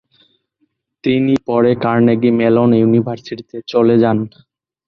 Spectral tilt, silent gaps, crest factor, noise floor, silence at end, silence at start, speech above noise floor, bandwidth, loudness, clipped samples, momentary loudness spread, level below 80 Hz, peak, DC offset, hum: -9 dB/octave; none; 14 dB; -66 dBFS; 0.6 s; 1.05 s; 52 dB; 6.4 kHz; -14 LUFS; under 0.1%; 13 LU; -54 dBFS; -2 dBFS; under 0.1%; none